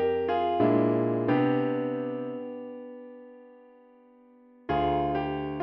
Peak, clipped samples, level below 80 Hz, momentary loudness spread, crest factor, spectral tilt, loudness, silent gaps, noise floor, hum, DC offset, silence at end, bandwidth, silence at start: -12 dBFS; under 0.1%; -54 dBFS; 20 LU; 16 dB; -6.5 dB/octave; -27 LUFS; none; -56 dBFS; none; under 0.1%; 0 s; 5.4 kHz; 0 s